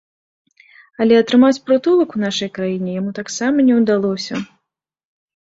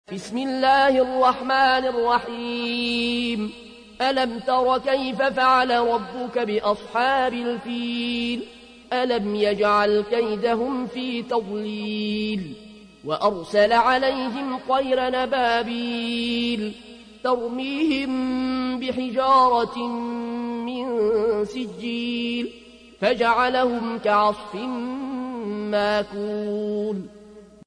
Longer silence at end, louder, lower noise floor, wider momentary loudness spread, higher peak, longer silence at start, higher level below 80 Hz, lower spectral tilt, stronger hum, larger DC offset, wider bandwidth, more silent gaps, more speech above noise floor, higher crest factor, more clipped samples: first, 1.1 s vs 0.2 s; first, -16 LUFS vs -23 LUFS; first, -74 dBFS vs -46 dBFS; about the same, 11 LU vs 11 LU; first, -2 dBFS vs -8 dBFS; first, 1 s vs 0.1 s; second, -62 dBFS vs -56 dBFS; about the same, -5.5 dB/octave vs -5 dB/octave; neither; neither; second, 7.8 kHz vs 10.5 kHz; neither; first, 58 dB vs 23 dB; about the same, 16 dB vs 16 dB; neither